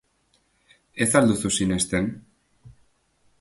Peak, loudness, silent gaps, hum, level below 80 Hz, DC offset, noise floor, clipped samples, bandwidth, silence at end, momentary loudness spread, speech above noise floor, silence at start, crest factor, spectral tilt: -4 dBFS; -22 LUFS; none; none; -50 dBFS; under 0.1%; -67 dBFS; under 0.1%; 12 kHz; 0.7 s; 17 LU; 45 dB; 0.95 s; 22 dB; -4 dB/octave